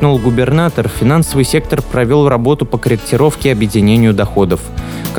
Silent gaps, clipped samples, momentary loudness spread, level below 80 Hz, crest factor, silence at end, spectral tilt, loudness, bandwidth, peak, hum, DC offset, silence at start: none; under 0.1%; 5 LU; -28 dBFS; 12 dB; 0 s; -6.5 dB/octave; -12 LUFS; over 20 kHz; 0 dBFS; none; under 0.1%; 0 s